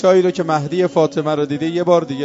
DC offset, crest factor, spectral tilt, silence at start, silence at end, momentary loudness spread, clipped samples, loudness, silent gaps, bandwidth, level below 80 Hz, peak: under 0.1%; 14 dB; -6.5 dB/octave; 0 s; 0 s; 5 LU; under 0.1%; -17 LUFS; none; 7.8 kHz; -60 dBFS; -2 dBFS